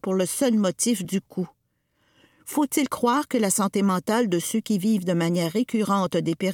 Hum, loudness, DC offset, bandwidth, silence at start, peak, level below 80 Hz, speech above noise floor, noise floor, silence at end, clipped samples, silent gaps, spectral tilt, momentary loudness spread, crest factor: none; -24 LUFS; under 0.1%; 18.5 kHz; 0.05 s; -8 dBFS; -68 dBFS; 48 dB; -71 dBFS; 0 s; under 0.1%; none; -5 dB/octave; 7 LU; 16 dB